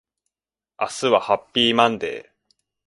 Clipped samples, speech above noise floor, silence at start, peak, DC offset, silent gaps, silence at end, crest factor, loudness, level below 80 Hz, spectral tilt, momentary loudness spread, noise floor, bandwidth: under 0.1%; over 70 dB; 0.8 s; 0 dBFS; under 0.1%; none; 0.65 s; 22 dB; -20 LUFS; -62 dBFS; -3.5 dB/octave; 13 LU; under -90 dBFS; 11.5 kHz